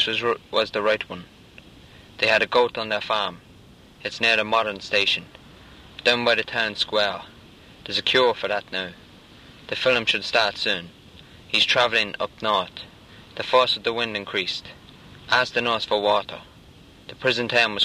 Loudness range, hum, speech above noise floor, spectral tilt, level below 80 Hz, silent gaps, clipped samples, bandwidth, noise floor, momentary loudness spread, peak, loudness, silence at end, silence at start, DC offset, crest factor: 3 LU; none; 26 dB; -3 dB/octave; -58 dBFS; none; under 0.1%; 14.5 kHz; -49 dBFS; 16 LU; -4 dBFS; -22 LUFS; 0 s; 0 s; under 0.1%; 20 dB